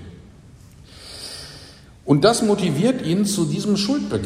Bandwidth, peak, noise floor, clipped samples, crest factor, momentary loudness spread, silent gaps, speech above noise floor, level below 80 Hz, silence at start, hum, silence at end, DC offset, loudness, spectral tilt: 16 kHz; -2 dBFS; -45 dBFS; under 0.1%; 20 dB; 21 LU; none; 27 dB; -50 dBFS; 0 s; none; 0 s; under 0.1%; -19 LUFS; -5.5 dB/octave